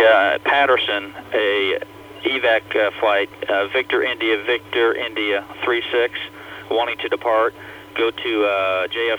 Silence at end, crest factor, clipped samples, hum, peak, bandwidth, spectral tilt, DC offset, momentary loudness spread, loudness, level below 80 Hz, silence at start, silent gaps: 0 s; 18 dB; under 0.1%; 60 Hz at -60 dBFS; -2 dBFS; 20 kHz; -4.5 dB/octave; under 0.1%; 8 LU; -19 LUFS; -60 dBFS; 0 s; none